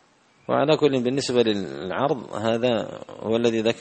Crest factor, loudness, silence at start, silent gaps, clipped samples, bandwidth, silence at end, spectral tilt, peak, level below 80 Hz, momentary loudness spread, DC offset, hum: 20 dB; -23 LUFS; 0.5 s; none; under 0.1%; 8.8 kHz; 0 s; -5.5 dB/octave; -4 dBFS; -62 dBFS; 9 LU; under 0.1%; none